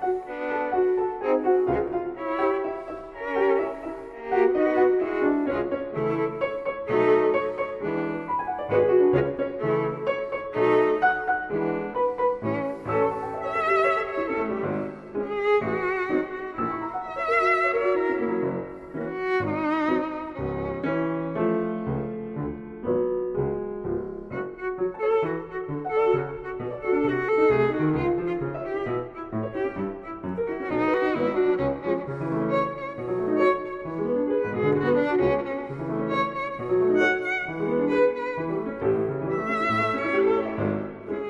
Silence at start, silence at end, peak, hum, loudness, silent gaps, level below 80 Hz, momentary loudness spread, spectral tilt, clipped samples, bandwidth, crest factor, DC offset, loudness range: 0 s; 0 s; -8 dBFS; none; -25 LUFS; none; -52 dBFS; 10 LU; -8 dB/octave; under 0.1%; 7.2 kHz; 16 dB; under 0.1%; 4 LU